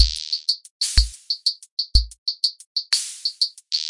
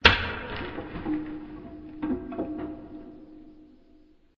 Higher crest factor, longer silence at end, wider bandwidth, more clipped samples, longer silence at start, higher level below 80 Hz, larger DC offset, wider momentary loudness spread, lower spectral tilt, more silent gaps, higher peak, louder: second, 22 dB vs 28 dB; second, 0 s vs 0.4 s; first, 11.5 kHz vs 7.6 kHz; neither; about the same, 0 s vs 0 s; first, -28 dBFS vs -44 dBFS; neither; second, 6 LU vs 17 LU; second, -0.5 dB/octave vs -2 dB/octave; first, 0.71-0.80 s, 1.71-1.77 s, 2.18-2.26 s, 2.66-2.75 s vs none; about the same, 0 dBFS vs -2 dBFS; first, -22 LUFS vs -31 LUFS